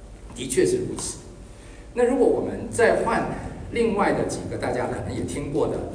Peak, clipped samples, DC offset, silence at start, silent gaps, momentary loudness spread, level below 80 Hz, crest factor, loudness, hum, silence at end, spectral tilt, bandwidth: -6 dBFS; under 0.1%; under 0.1%; 0 s; none; 16 LU; -42 dBFS; 18 dB; -24 LUFS; none; 0 s; -5 dB/octave; 10.5 kHz